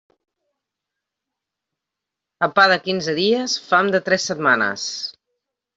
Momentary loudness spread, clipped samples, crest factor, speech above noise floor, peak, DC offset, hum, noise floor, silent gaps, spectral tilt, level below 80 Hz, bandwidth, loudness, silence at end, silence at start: 10 LU; under 0.1%; 20 dB; 65 dB; -2 dBFS; under 0.1%; none; -84 dBFS; none; -3 dB/octave; -66 dBFS; 8 kHz; -18 LUFS; 0.65 s; 2.4 s